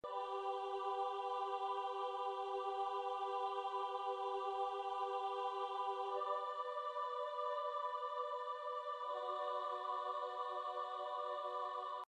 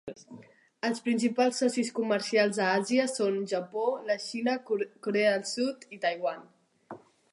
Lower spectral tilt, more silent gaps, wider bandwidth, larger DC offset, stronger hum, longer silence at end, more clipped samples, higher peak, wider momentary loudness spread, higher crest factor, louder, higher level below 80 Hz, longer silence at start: second, -2 dB/octave vs -4 dB/octave; neither; second, 10 kHz vs 11.5 kHz; neither; neither; second, 0.05 s vs 0.35 s; neither; second, -30 dBFS vs -12 dBFS; second, 2 LU vs 15 LU; second, 12 dB vs 18 dB; second, -42 LUFS vs -29 LUFS; second, -86 dBFS vs -80 dBFS; about the same, 0.05 s vs 0.05 s